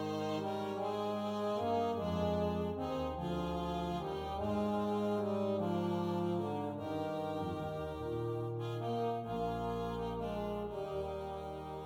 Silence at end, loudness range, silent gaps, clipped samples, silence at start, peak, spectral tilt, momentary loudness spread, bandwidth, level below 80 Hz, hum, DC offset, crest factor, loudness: 0 s; 3 LU; none; under 0.1%; 0 s; -22 dBFS; -7.5 dB/octave; 5 LU; 16.5 kHz; -56 dBFS; none; under 0.1%; 14 dB; -38 LUFS